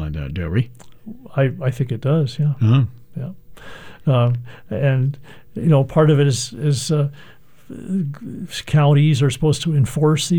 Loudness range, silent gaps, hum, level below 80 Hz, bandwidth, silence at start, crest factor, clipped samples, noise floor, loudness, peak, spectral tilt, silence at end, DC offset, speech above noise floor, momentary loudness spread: 3 LU; none; none; -44 dBFS; 16 kHz; 0 s; 16 dB; under 0.1%; -38 dBFS; -19 LUFS; -4 dBFS; -6.5 dB/octave; 0 s; 0.8%; 20 dB; 17 LU